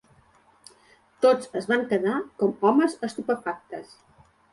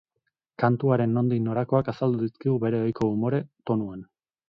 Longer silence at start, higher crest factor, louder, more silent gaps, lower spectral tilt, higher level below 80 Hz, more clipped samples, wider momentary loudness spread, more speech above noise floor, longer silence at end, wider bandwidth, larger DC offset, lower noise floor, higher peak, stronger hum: first, 1.2 s vs 0.6 s; about the same, 18 dB vs 18 dB; about the same, -24 LUFS vs -25 LUFS; neither; second, -5.5 dB/octave vs -10 dB/octave; second, -70 dBFS vs -60 dBFS; neither; first, 13 LU vs 6 LU; second, 35 dB vs 55 dB; first, 0.7 s vs 0.45 s; first, 11.5 kHz vs 6.2 kHz; neither; second, -59 dBFS vs -79 dBFS; about the same, -8 dBFS vs -8 dBFS; neither